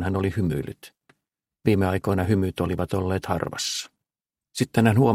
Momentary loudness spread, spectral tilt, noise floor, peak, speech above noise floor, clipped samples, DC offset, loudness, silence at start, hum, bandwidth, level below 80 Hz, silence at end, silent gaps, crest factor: 11 LU; -6 dB/octave; under -90 dBFS; -4 dBFS; over 67 dB; under 0.1%; under 0.1%; -24 LUFS; 0 s; none; 16 kHz; -50 dBFS; 0 s; none; 20 dB